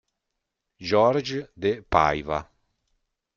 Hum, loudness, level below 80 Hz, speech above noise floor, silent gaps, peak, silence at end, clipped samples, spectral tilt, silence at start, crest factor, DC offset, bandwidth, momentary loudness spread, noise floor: none; -24 LUFS; -50 dBFS; 59 dB; none; -2 dBFS; 0.95 s; under 0.1%; -6 dB/octave; 0.8 s; 24 dB; under 0.1%; 7.4 kHz; 11 LU; -82 dBFS